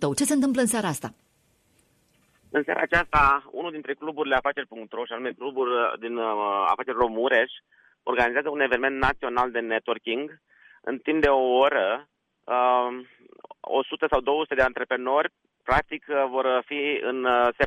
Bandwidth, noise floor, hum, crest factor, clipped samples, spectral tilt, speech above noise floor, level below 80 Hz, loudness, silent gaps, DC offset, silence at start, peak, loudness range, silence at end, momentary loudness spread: 14 kHz; -66 dBFS; none; 18 dB; under 0.1%; -3.5 dB/octave; 41 dB; -48 dBFS; -25 LUFS; none; under 0.1%; 0 s; -8 dBFS; 2 LU; 0 s; 12 LU